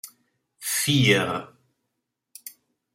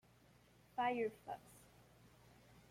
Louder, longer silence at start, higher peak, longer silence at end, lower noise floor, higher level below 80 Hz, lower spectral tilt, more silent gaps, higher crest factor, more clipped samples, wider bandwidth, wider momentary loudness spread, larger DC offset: first, -22 LUFS vs -43 LUFS; second, 0.05 s vs 0.75 s; first, -6 dBFS vs -30 dBFS; second, 0.45 s vs 0.65 s; first, -81 dBFS vs -69 dBFS; first, -64 dBFS vs -76 dBFS; second, -3.5 dB/octave vs -5 dB/octave; neither; about the same, 22 dB vs 18 dB; neither; about the same, 16 kHz vs 16.5 kHz; second, 24 LU vs 27 LU; neither